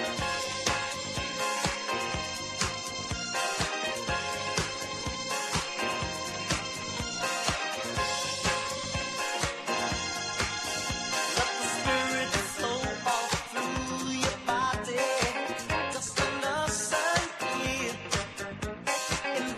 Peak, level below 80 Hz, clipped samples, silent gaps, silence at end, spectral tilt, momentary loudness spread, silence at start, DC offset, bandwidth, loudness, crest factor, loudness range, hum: -10 dBFS; -48 dBFS; under 0.1%; none; 0 s; -2.5 dB/octave; 5 LU; 0 s; under 0.1%; 13 kHz; -30 LUFS; 20 dB; 2 LU; none